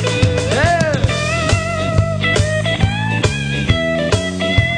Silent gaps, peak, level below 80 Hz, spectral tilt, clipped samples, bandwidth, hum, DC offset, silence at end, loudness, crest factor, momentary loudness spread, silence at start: none; -2 dBFS; -28 dBFS; -5 dB/octave; under 0.1%; 10 kHz; none; under 0.1%; 0 s; -16 LUFS; 14 dB; 3 LU; 0 s